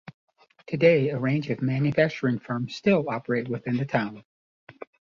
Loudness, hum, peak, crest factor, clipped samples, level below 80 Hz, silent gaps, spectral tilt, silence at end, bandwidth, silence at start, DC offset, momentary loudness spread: -25 LUFS; none; -6 dBFS; 20 dB; under 0.1%; -62 dBFS; 4.25-4.67 s; -8 dB/octave; 0.3 s; 7.2 kHz; 0.7 s; under 0.1%; 11 LU